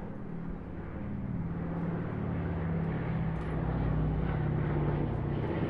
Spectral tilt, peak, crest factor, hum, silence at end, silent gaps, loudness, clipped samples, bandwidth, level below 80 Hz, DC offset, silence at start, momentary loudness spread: -10.5 dB/octave; -20 dBFS; 14 dB; none; 0 s; none; -34 LUFS; under 0.1%; 4.5 kHz; -42 dBFS; under 0.1%; 0 s; 9 LU